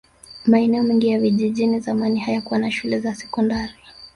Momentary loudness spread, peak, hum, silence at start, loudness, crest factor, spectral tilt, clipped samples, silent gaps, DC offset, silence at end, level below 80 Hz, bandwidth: 7 LU; -4 dBFS; none; 0.3 s; -20 LUFS; 16 dB; -6.5 dB/octave; under 0.1%; none; under 0.1%; 0.1 s; -52 dBFS; 11 kHz